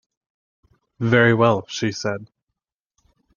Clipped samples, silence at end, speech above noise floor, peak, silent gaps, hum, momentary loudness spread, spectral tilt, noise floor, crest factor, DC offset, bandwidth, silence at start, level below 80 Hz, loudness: under 0.1%; 1.1 s; 63 dB; -2 dBFS; none; none; 12 LU; -6 dB/octave; -82 dBFS; 20 dB; under 0.1%; 7.2 kHz; 1 s; -62 dBFS; -19 LUFS